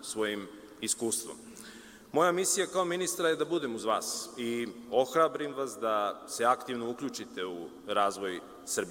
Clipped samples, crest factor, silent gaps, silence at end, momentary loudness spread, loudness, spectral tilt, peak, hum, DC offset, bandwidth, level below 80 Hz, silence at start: under 0.1%; 20 dB; none; 0 s; 13 LU; -31 LUFS; -2.5 dB/octave; -12 dBFS; none; under 0.1%; 16.5 kHz; -72 dBFS; 0 s